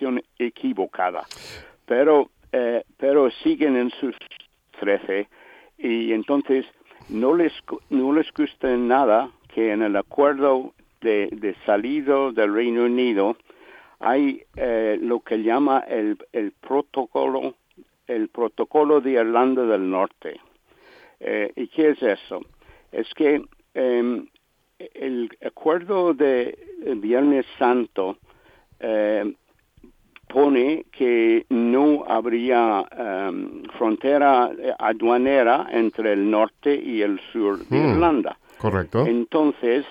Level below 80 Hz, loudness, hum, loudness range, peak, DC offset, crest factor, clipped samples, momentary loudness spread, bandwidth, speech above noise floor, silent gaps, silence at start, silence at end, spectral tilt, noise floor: -58 dBFS; -22 LUFS; none; 4 LU; -4 dBFS; under 0.1%; 18 dB; under 0.1%; 12 LU; 7.8 kHz; 34 dB; none; 0 s; 0 s; -7.5 dB/octave; -55 dBFS